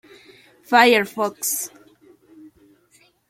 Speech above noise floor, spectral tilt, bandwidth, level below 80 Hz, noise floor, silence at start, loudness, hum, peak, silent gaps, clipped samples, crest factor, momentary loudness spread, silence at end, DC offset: 40 dB; -2 dB/octave; 16.5 kHz; -72 dBFS; -58 dBFS; 0.7 s; -18 LUFS; none; -2 dBFS; none; under 0.1%; 20 dB; 12 LU; 1.65 s; under 0.1%